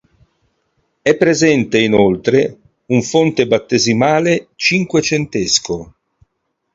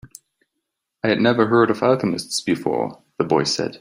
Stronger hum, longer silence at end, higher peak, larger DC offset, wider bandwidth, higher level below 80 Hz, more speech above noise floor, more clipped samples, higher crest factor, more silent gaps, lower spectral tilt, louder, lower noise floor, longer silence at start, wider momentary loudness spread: neither; first, 0.9 s vs 0.05 s; about the same, 0 dBFS vs -2 dBFS; neither; second, 8 kHz vs 15.5 kHz; first, -48 dBFS vs -60 dBFS; about the same, 57 dB vs 60 dB; neither; about the same, 16 dB vs 18 dB; neither; about the same, -4.5 dB/octave vs -5 dB/octave; first, -14 LUFS vs -20 LUFS; second, -71 dBFS vs -79 dBFS; first, 1.05 s vs 0.05 s; second, 6 LU vs 9 LU